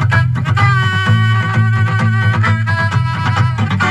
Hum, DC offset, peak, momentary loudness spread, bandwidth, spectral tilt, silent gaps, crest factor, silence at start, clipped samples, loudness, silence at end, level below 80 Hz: none; 0.5%; 0 dBFS; 3 LU; 8.6 kHz; -6.5 dB/octave; none; 12 dB; 0 s; under 0.1%; -13 LUFS; 0 s; -38 dBFS